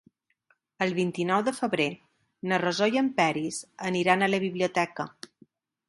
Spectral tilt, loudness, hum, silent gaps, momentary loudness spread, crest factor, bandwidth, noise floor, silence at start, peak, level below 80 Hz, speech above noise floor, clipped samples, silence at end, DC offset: -5 dB/octave; -27 LUFS; none; none; 13 LU; 22 dB; 11.5 kHz; -70 dBFS; 0.8 s; -6 dBFS; -72 dBFS; 44 dB; under 0.1%; 0.8 s; under 0.1%